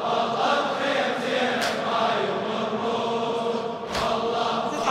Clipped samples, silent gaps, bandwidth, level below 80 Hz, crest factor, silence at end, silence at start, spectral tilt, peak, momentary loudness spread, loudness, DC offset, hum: under 0.1%; none; 16 kHz; -56 dBFS; 16 dB; 0 s; 0 s; -4 dB/octave; -8 dBFS; 4 LU; -25 LUFS; under 0.1%; none